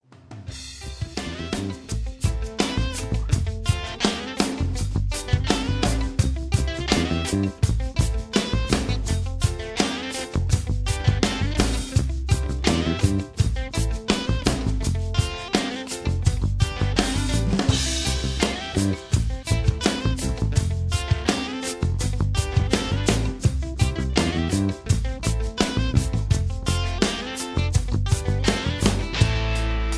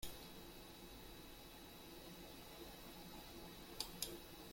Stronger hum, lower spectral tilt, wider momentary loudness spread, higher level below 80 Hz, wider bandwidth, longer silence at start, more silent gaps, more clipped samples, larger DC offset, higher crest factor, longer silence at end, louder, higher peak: neither; first, -5 dB/octave vs -2.5 dB/octave; second, 5 LU vs 8 LU; first, -28 dBFS vs -64 dBFS; second, 11 kHz vs 16.5 kHz; first, 0.3 s vs 0 s; neither; neither; neither; second, 20 dB vs 30 dB; about the same, 0 s vs 0 s; first, -24 LUFS vs -53 LUFS; first, -2 dBFS vs -24 dBFS